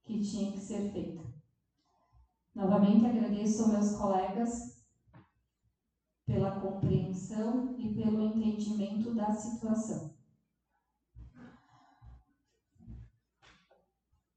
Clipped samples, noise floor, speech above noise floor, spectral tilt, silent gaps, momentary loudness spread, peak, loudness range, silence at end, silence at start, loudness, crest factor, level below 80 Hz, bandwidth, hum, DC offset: under 0.1%; -85 dBFS; 54 dB; -7.5 dB/octave; none; 20 LU; -14 dBFS; 8 LU; 1.3 s; 0.1 s; -32 LUFS; 20 dB; -60 dBFS; 8.8 kHz; none; under 0.1%